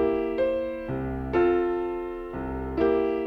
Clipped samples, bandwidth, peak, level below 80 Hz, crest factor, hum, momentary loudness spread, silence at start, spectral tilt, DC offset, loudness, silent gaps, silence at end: under 0.1%; 5.2 kHz; -12 dBFS; -42 dBFS; 14 dB; none; 10 LU; 0 s; -9 dB/octave; under 0.1%; -27 LUFS; none; 0 s